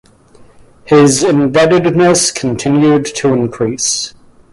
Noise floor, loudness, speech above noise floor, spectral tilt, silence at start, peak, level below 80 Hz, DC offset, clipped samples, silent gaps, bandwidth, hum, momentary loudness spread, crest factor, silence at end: -42 dBFS; -11 LUFS; 32 dB; -4.5 dB/octave; 0.85 s; 0 dBFS; -46 dBFS; under 0.1%; under 0.1%; none; 11.5 kHz; none; 7 LU; 12 dB; 0.4 s